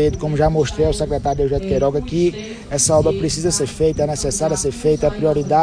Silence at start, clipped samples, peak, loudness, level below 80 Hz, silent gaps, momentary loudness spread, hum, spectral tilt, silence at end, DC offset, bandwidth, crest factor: 0 s; under 0.1%; -4 dBFS; -18 LUFS; -32 dBFS; none; 4 LU; none; -5 dB/octave; 0 s; under 0.1%; 10.5 kHz; 14 dB